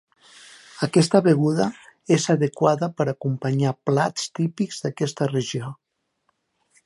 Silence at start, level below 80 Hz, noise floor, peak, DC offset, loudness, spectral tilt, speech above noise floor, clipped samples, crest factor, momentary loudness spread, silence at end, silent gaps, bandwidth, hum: 0.75 s; -68 dBFS; -72 dBFS; -4 dBFS; under 0.1%; -22 LUFS; -6 dB/octave; 50 dB; under 0.1%; 20 dB; 11 LU; 1.1 s; none; 11.5 kHz; none